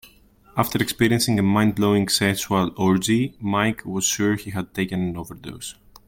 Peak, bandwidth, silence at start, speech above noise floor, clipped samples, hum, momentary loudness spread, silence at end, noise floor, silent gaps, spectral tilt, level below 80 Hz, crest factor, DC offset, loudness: -6 dBFS; 17 kHz; 0.05 s; 32 dB; under 0.1%; none; 13 LU; 0.35 s; -53 dBFS; none; -4.5 dB/octave; -52 dBFS; 16 dB; under 0.1%; -21 LUFS